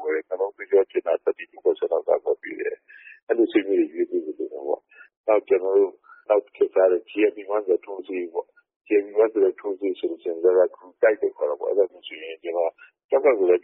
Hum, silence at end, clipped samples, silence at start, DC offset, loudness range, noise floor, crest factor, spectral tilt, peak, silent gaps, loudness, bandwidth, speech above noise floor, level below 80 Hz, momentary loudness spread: none; 0.05 s; under 0.1%; 0 s; under 0.1%; 2 LU; -43 dBFS; 16 dB; 2 dB/octave; -6 dBFS; 3.23-3.27 s, 5.17-5.24 s, 8.76-8.80 s, 13.04-13.09 s; -23 LUFS; 3.9 kHz; 21 dB; -76 dBFS; 11 LU